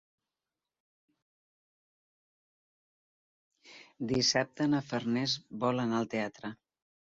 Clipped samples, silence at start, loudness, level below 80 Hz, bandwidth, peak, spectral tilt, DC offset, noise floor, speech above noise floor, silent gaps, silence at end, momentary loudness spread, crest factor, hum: under 0.1%; 3.65 s; -31 LUFS; -70 dBFS; 7.8 kHz; -14 dBFS; -4 dB/octave; under 0.1%; under -90 dBFS; over 58 dB; none; 0.6 s; 12 LU; 22 dB; none